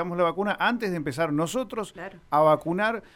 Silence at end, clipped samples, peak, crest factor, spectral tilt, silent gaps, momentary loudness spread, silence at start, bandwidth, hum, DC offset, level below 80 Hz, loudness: 0.1 s; under 0.1%; -8 dBFS; 16 dB; -5.5 dB/octave; none; 12 LU; 0 s; 17 kHz; none; under 0.1%; -58 dBFS; -25 LUFS